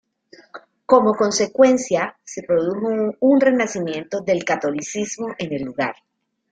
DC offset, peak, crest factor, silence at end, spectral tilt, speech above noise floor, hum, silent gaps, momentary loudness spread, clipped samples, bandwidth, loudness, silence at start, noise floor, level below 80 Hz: under 0.1%; -2 dBFS; 18 dB; 0.6 s; -4.5 dB/octave; 32 dB; none; none; 11 LU; under 0.1%; 9.4 kHz; -20 LUFS; 0.55 s; -51 dBFS; -62 dBFS